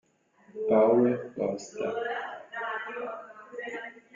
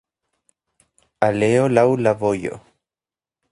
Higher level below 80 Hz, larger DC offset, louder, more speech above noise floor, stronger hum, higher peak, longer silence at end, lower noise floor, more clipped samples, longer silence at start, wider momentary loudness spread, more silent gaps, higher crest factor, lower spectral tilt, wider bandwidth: second, -74 dBFS vs -56 dBFS; neither; second, -29 LUFS vs -18 LUFS; second, 34 dB vs over 73 dB; neither; second, -12 dBFS vs 0 dBFS; second, 0.15 s vs 0.95 s; second, -61 dBFS vs under -90 dBFS; neither; second, 0.55 s vs 1.2 s; first, 18 LU vs 12 LU; neither; about the same, 18 dB vs 22 dB; about the same, -6 dB/octave vs -7 dB/octave; second, 7.6 kHz vs 11 kHz